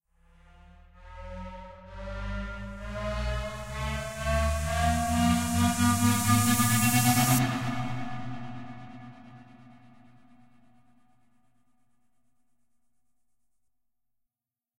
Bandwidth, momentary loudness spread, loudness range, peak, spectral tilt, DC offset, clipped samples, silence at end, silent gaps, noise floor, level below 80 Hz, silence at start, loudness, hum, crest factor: 16 kHz; 21 LU; 16 LU; -10 dBFS; -4.5 dB/octave; under 0.1%; under 0.1%; 5.05 s; none; under -90 dBFS; -42 dBFS; 0.7 s; -27 LUFS; none; 20 dB